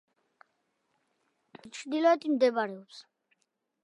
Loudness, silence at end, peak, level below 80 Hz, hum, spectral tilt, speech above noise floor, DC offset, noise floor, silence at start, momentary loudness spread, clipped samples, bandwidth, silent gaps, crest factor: -28 LUFS; 0.8 s; -12 dBFS; -88 dBFS; none; -4.5 dB/octave; 51 dB; under 0.1%; -79 dBFS; 1.65 s; 20 LU; under 0.1%; 11 kHz; none; 20 dB